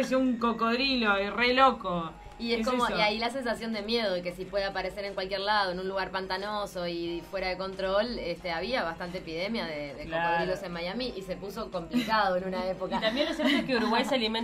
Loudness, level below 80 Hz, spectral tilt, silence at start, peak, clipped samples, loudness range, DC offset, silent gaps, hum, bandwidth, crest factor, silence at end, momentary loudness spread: -29 LUFS; -52 dBFS; -4.5 dB/octave; 0 s; -8 dBFS; under 0.1%; 5 LU; under 0.1%; none; none; 15.5 kHz; 20 dB; 0 s; 9 LU